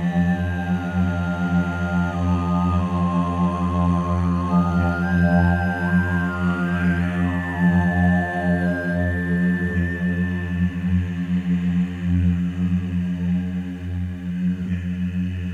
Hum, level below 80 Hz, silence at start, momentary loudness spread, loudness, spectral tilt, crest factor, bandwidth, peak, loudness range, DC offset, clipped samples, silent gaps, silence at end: none; -38 dBFS; 0 s; 6 LU; -22 LUFS; -8.5 dB/octave; 14 dB; 7 kHz; -6 dBFS; 3 LU; under 0.1%; under 0.1%; none; 0 s